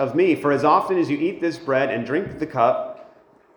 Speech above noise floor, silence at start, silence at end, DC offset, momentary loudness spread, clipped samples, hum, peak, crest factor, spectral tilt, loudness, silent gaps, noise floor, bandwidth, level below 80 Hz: 32 dB; 0 s; 0.5 s; under 0.1%; 9 LU; under 0.1%; none; -4 dBFS; 18 dB; -7 dB/octave; -21 LUFS; none; -52 dBFS; 19.5 kHz; -60 dBFS